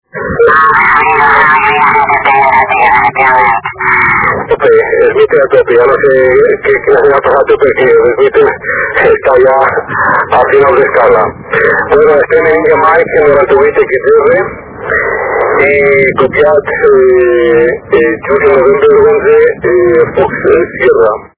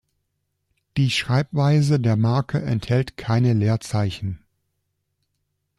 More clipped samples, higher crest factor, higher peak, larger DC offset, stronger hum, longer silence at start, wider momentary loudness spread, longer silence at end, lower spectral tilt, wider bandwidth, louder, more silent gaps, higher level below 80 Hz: first, 2% vs under 0.1%; second, 6 dB vs 16 dB; first, 0 dBFS vs -8 dBFS; neither; neither; second, 0.15 s vs 0.95 s; second, 5 LU vs 9 LU; second, 0.15 s vs 1.4 s; first, -9 dB/octave vs -6.5 dB/octave; second, 4 kHz vs 12 kHz; first, -7 LUFS vs -21 LUFS; neither; first, -36 dBFS vs -52 dBFS